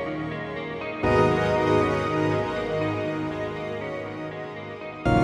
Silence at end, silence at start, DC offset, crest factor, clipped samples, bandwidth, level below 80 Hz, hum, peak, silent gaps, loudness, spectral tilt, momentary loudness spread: 0 s; 0 s; under 0.1%; 16 dB; under 0.1%; 12 kHz; -44 dBFS; none; -8 dBFS; none; -26 LUFS; -7 dB/octave; 12 LU